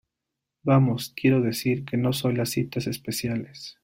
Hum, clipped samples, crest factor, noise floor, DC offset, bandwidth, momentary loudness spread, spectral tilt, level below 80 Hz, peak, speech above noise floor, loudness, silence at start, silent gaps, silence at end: none; under 0.1%; 18 dB; -85 dBFS; under 0.1%; 16.5 kHz; 9 LU; -6 dB/octave; -58 dBFS; -6 dBFS; 60 dB; -25 LUFS; 0.65 s; none; 0.1 s